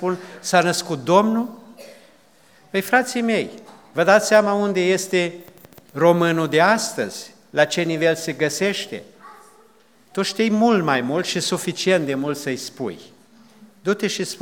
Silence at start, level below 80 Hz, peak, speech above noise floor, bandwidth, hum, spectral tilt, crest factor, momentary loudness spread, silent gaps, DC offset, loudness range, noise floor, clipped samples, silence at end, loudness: 0 s; -74 dBFS; 0 dBFS; 35 dB; over 20 kHz; none; -4 dB/octave; 20 dB; 13 LU; none; 0.1%; 4 LU; -55 dBFS; under 0.1%; 0.05 s; -20 LUFS